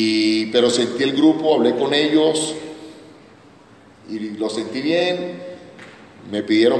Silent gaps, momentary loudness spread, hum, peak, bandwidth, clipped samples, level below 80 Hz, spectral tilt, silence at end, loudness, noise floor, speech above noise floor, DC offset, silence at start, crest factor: none; 19 LU; none; -2 dBFS; 10 kHz; under 0.1%; -66 dBFS; -4 dB/octave; 0 s; -19 LUFS; -47 dBFS; 29 dB; under 0.1%; 0 s; 18 dB